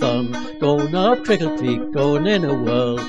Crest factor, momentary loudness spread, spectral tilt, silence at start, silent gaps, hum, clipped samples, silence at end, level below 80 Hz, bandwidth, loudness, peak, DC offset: 14 dB; 5 LU; -6.5 dB/octave; 0 s; none; none; under 0.1%; 0 s; -50 dBFS; 10.5 kHz; -19 LUFS; -4 dBFS; 2%